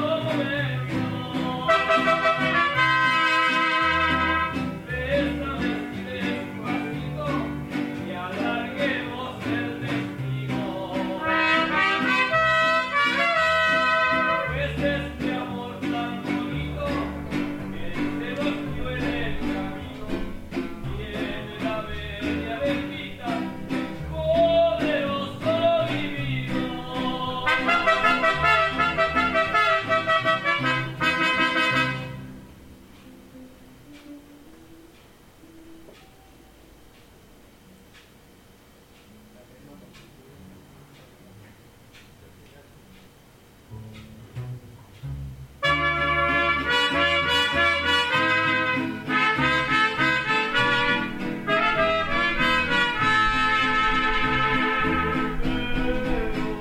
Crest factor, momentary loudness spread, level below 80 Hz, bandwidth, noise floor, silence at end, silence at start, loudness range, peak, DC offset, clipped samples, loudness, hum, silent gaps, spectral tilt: 18 dB; 12 LU; -42 dBFS; 16.5 kHz; -52 dBFS; 0 s; 0 s; 9 LU; -8 dBFS; under 0.1%; under 0.1%; -23 LUFS; none; none; -5 dB/octave